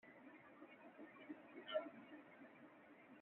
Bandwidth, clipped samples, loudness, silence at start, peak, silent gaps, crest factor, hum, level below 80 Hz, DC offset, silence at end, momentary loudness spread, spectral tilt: 4 kHz; under 0.1%; -56 LUFS; 0.05 s; -32 dBFS; none; 24 dB; none; under -90 dBFS; under 0.1%; 0 s; 16 LU; -2 dB/octave